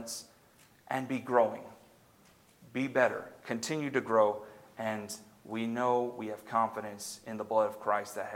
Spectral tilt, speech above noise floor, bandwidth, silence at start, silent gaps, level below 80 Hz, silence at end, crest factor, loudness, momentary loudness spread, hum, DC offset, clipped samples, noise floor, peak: -4.5 dB/octave; 30 dB; 17 kHz; 0 s; none; -78 dBFS; 0 s; 22 dB; -33 LUFS; 13 LU; none; under 0.1%; under 0.1%; -62 dBFS; -10 dBFS